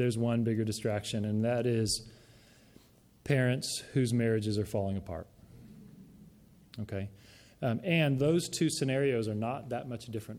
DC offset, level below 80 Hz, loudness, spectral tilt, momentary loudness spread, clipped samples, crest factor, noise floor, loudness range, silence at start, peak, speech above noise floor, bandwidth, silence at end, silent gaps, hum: under 0.1%; -60 dBFS; -32 LUFS; -5.5 dB/octave; 12 LU; under 0.1%; 18 dB; -60 dBFS; 6 LU; 0 s; -14 dBFS; 29 dB; 16 kHz; 0 s; none; none